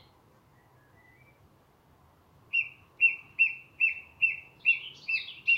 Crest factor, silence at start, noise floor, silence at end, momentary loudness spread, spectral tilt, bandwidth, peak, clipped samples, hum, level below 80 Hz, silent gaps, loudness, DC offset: 18 dB; 2.55 s; -62 dBFS; 0 s; 6 LU; -1.5 dB/octave; 11.5 kHz; -14 dBFS; under 0.1%; none; -72 dBFS; none; -27 LUFS; under 0.1%